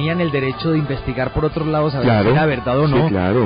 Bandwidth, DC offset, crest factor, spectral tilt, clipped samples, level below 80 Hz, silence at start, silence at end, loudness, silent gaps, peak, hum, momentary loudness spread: 5.2 kHz; under 0.1%; 10 dB; -6 dB/octave; under 0.1%; -36 dBFS; 0 s; 0 s; -17 LUFS; none; -6 dBFS; none; 5 LU